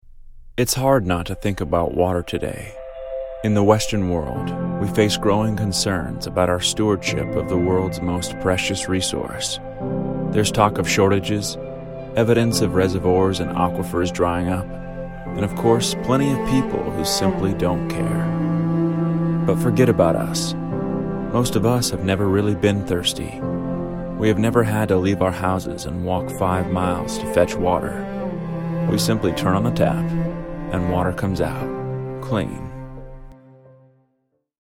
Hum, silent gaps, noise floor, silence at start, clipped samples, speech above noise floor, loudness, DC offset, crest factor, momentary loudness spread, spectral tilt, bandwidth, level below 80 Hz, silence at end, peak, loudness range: none; none; -70 dBFS; 0.15 s; under 0.1%; 50 dB; -21 LUFS; under 0.1%; 20 dB; 9 LU; -5.5 dB/octave; 16.5 kHz; -38 dBFS; 1.25 s; 0 dBFS; 3 LU